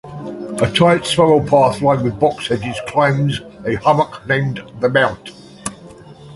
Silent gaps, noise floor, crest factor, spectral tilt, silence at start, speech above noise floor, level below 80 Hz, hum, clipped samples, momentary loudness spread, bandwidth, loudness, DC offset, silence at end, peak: none; -39 dBFS; 16 dB; -5.5 dB/octave; 0.05 s; 23 dB; -46 dBFS; none; under 0.1%; 16 LU; 11.5 kHz; -16 LUFS; under 0.1%; 0 s; 0 dBFS